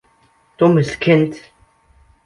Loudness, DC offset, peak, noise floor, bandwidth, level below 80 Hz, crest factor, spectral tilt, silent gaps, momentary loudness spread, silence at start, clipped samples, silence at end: -16 LUFS; under 0.1%; -2 dBFS; -56 dBFS; 11.5 kHz; -52 dBFS; 16 dB; -7.5 dB/octave; none; 8 LU; 0.6 s; under 0.1%; 0.85 s